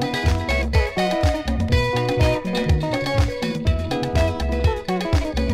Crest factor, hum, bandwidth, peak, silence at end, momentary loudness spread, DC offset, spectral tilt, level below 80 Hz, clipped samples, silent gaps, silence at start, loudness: 14 dB; none; 15 kHz; -6 dBFS; 0 s; 3 LU; under 0.1%; -6 dB/octave; -26 dBFS; under 0.1%; none; 0 s; -21 LUFS